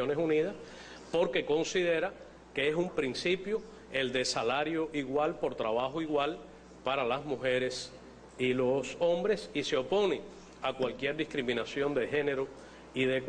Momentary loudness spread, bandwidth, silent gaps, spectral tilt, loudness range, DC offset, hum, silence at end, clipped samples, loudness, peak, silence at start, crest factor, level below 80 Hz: 11 LU; 10 kHz; none; -4.5 dB/octave; 1 LU; under 0.1%; none; 0 s; under 0.1%; -32 LUFS; -18 dBFS; 0 s; 14 dB; -62 dBFS